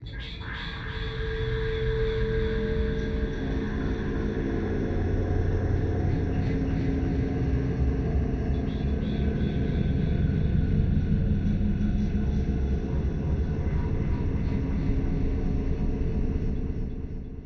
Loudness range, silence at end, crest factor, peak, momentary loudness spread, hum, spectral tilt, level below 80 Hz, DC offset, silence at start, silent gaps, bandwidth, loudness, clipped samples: 3 LU; 0 s; 14 dB; -12 dBFS; 5 LU; none; -9 dB/octave; -30 dBFS; under 0.1%; 0 s; none; 6.4 kHz; -28 LUFS; under 0.1%